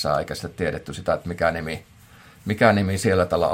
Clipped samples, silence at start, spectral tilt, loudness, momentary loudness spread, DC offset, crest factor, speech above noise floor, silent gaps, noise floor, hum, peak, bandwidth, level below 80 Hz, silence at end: under 0.1%; 0 s; -5.5 dB/octave; -23 LUFS; 13 LU; under 0.1%; 20 dB; 27 dB; none; -49 dBFS; none; -2 dBFS; 16.5 kHz; -50 dBFS; 0 s